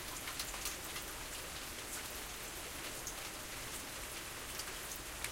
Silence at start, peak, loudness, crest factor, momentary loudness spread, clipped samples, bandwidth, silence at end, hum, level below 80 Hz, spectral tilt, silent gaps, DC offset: 0 s; -20 dBFS; -43 LUFS; 24 dB; 3 LU; under 0.1%; 17 kHz; 0 s; none; -56 dBFS; -1.5 dB/octave; none; under 0.1%